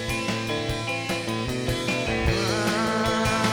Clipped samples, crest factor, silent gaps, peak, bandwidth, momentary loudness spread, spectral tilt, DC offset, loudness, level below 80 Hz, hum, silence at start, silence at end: under 0.1%; 16 dB; none; -10 dBFS; over 20 kHz; 4 LU; -4.5 dB/octave; under 0.1%; -25 LUFS; -38 dBFS; none; 0 s; 0 s